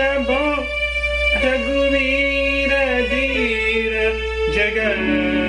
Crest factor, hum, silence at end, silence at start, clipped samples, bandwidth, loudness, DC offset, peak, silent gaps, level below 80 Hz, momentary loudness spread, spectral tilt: 12 dB; none; 0 s; 0 s; under 0.1%; 10.5 kHz; -18 LUFS; under 0.1%; -6 dBFS; none; -30 dBFS; 3 LU; -5 dB/octave